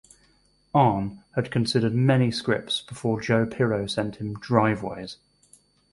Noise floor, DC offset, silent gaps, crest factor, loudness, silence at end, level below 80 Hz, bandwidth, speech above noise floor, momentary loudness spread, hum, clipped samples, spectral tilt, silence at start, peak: -63 dBFS; under 0.1%; none; 22 dB; -24 LUFS; 0.8 s; -54 dBFS; 11.5 kHz; 39 dB; 10 LU; 50 Hz at -50 dBFS; under 0.1%; -6.5 dB/octave; 0.75 s; -4 dBFS